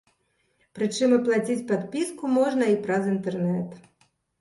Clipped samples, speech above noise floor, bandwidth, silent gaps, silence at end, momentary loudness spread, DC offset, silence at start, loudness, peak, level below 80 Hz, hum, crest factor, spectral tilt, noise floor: under 0.1%; 46 dB; 11.5 kHz; none; 0.6 s; 8 LU; under 0.1%; 0.75 s; -25 LUFS; -10 dBFS; -68 dBFS; none; 16 dB; -6 dB/octave; -70 dBFS